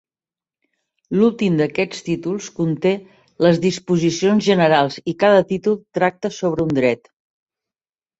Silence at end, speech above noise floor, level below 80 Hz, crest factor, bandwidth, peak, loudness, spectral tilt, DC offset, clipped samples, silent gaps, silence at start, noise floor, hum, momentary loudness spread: 1.25 s; over 72 dB; -56 dBFS; 18 dB; 8 kHz; -2 dBFS; -18 LUFS; -6 dB/octave; under 0.1%; under 0.1%; none; 1.1 s; under -90 dBFS; none; 8 LU